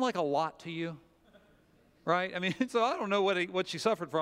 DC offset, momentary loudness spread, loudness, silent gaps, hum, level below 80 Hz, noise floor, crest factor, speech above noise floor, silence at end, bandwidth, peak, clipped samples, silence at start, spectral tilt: under 0.1%; 9 LU; -32 LUFS; none; none; -74 dBFS; -65 dBFS; 20 dB; 34 dB; 0 s; 15.5 kHz; -12 dBFS; under 0.1%; 0 s; -5 dB/octave